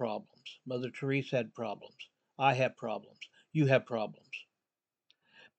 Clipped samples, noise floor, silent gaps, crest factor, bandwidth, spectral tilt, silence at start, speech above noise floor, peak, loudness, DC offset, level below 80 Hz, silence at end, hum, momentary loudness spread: under 0.1%; under -90 dBFS; none; 22 dB; 8.4 kHz; -7 dB/octave; 0 s; over 56 dB; -12 dBFS; -33 LUFS; under 0.1%; -86 dBFS; 1.15 s; none; 22 LU